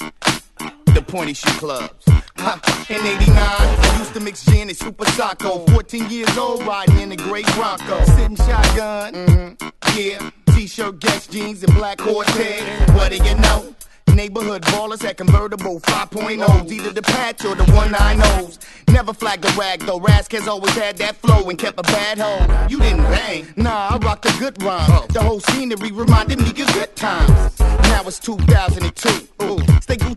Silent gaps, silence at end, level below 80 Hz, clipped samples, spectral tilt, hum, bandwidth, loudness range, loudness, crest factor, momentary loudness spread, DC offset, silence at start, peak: none; 0 s; -20 dBFS; under 0.1%; -5 dB/octave; none; 12.5 kHz; 2 LU; -17 LUFS; 16 dB; 8 LU; under 0.1%; 0 s; 0 dBFS